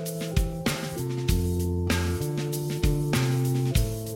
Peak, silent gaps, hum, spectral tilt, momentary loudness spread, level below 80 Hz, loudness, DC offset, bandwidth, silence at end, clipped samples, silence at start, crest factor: -10 dBFS; none; none; -5.5 dB/octave; 4 LU; -34 dBFS; -27 LUFS; under 0.1%; 16.5 kHz; 0 s; under 0.1%; 0 s; 16 dB